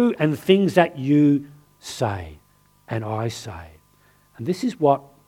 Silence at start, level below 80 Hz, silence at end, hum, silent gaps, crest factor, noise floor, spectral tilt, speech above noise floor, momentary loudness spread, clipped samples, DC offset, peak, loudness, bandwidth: 0 s; -54 dBFS; 0.3 s; 50 Hz at -55 dBFS; none; 20 dB; -58 dBFS; -6.5 dB/octave; 37 dB; 18 LU; under 0.1%; under 0.1%; -2 dBFS; -21 LUFS; 15.5 kHz